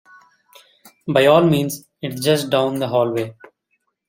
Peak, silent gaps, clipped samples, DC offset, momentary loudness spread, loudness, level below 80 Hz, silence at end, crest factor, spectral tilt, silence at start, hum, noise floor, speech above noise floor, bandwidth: -2 dBFS; none; under 0.1%; under 0.1%; 16 LU; -18 LUFS; -60 dBFS; 0.75 s; 18 dB; -5.5 dB/octave; 1.05 s; none; -71 dBFS; 54 dB; 16.5 kHz